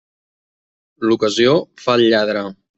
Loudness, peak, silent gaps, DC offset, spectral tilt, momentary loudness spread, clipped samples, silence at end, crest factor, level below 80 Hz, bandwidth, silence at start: -16 LUFS; -2 dBFS; none; under 0.1%; -5 dB/octave; 8 LU; under 0.1%; 0.25 s; 16 dB; -60 dBFS; 8.2 kHz; 1 s